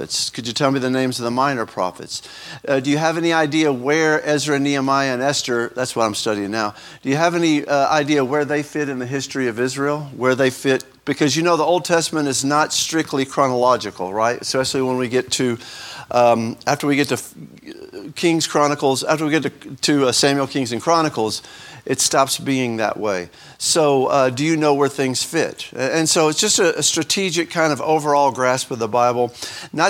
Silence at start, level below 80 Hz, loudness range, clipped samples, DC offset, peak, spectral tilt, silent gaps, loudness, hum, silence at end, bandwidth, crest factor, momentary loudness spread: 0 s; -62 dBFS; 3 LU; under 0.1%; under 0.1%; 0 dBFS; -3.5 dB/octave; none; -18 LUFS; none; 0 s; 17.5 kHz; 18 dB; 9 LU